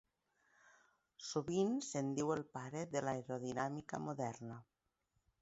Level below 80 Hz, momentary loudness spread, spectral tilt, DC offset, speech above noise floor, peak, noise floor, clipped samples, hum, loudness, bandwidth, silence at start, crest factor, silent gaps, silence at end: -76 dBFS; 11 LU; -6 dB/octave; under 0.1%; 44 dB; -24 dBFS; -85 dBFS; under 0.1%; none; -42 LUFS; 8 kHz; 0.65 s; 18 dB; none; 0.8 s